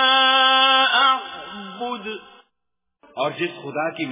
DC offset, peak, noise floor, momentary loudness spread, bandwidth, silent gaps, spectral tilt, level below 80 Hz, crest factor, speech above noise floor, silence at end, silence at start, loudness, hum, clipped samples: under 0.1%; -6 dBFS; -81 dBFS; 20 LU; 3.8 kHz; none; -6 dB/octave; -68 dBFS; 16 dB; 55 dB; 0 s; 0 s; -17 LUFS; none; under 0.1%